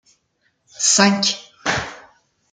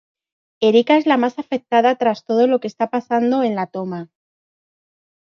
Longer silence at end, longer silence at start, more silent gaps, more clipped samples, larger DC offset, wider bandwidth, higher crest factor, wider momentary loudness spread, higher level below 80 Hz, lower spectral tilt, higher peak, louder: second, 0.55 s vs 1.35 s; first, 0.8 s vs 0.6 s; neither; neither; neither; first, 10 kHz vs 7 kHz; about the same, 20 dB vs 16 dB; about the same, 11 LU vs 11 LU; first, -54 dBFS vs -72 dBFS; second, -2 dB/octave vs -6.5 dB/octave; about the same, -2 dBFS vs -2 dBFS; about the same, -17 LUFS vs -18 LUFS